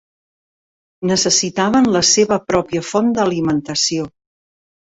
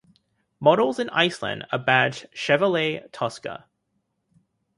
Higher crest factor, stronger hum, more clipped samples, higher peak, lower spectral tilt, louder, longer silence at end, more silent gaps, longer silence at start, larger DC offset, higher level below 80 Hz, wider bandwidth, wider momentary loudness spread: second, 16 dB vs 22 dB; neither; neither; about the same, -2 dBFS vs -2 dBFS; second, -3.5 dB/octave vs -5 dB/octave; first, -16 LUFS vs -22 LUFS; second, 0.8 s vs 1.2 s; neither; first, 1 s vs 0.6 s; neither; first, -50 dBFS vs -66 dBFS; second, 8.4 kHz vs 11.5 kHz; second, 7 LU vs 11 LU